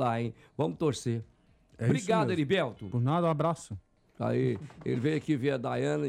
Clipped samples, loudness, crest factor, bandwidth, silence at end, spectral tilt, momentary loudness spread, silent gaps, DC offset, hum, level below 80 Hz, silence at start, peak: under 0.1%; -31 LUFS; 14 dB; 11.5 kHz; 0 s; -6.5 dB/octave; 9 LU; none; under 0.1%; none; -64 dBFS; 0 s; -16 dBFS